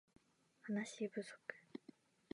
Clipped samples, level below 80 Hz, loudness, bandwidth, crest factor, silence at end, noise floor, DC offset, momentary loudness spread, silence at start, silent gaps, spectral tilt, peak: under 0.1%; under -90 dBFS; -48 LUFS; 11 kHz; 22 dB; 0.55 s; -69 dBFS; under 0.1%; 13 LU; 0.65 s; none; -5 dB/octave; -28 dBFS